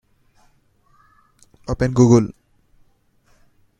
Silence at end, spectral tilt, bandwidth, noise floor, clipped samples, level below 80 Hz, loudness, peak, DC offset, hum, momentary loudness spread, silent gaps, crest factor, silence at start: 1.5 s; -7.5 dB/octave; 9.2 kHz; -59 dBFS; under 0.1%; -44 dBFS; -17 LUFS; 0 dBFS; under 0.1%; none; 17 LU; none; 22 dB; 1.7 s